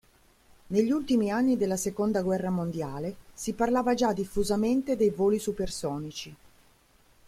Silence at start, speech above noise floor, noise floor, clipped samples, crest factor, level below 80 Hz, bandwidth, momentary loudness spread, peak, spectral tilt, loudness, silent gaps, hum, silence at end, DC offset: 0.7 s; 34 dB; -62 dBFS; under 0.1%; 16 dB; -52 dBFS; 15.5 kHz; 11 LU; -12 dBFS; -5.5 dB/octave; -28 LUFS; none; none; 0.95 s; under 0.1%